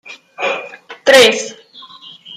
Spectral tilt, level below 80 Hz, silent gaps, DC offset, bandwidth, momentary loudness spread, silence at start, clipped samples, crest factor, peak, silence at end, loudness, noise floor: -1 dB/octave; -60 dBFS; none; under 0.1%; 16 kHz; 23 LU; 0.1 s; under 0.1%; 16 dB; 0 dBFS; 0 s; -12 LUFS; -39 dBFS